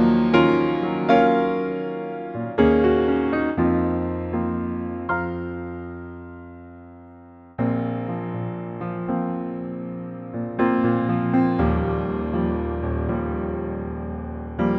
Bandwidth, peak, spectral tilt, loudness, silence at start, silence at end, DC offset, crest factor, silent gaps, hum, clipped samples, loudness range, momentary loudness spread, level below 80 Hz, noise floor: 6 kHz; -4 dBFS; -9.5 dB/octave; -23 LUFS; 0 s; 0 s; under 0.1%; 20 dB; none; none; under 0.1%; 9 LU; 15 LU; -38 dBFS; -45 dBFS